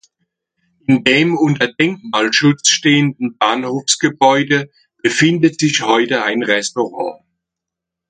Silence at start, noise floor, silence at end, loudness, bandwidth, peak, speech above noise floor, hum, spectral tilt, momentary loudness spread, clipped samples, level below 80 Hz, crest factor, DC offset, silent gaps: 0.9 s; -82 dBFS; 0.95 s; -14 LUFS; 9.6 kHz; 0 dBFS; 68 dB; none; -3.5 dB/octave; 8 LU; under 0.1%; -60 dBFS; 16 dB; under 0.1%; none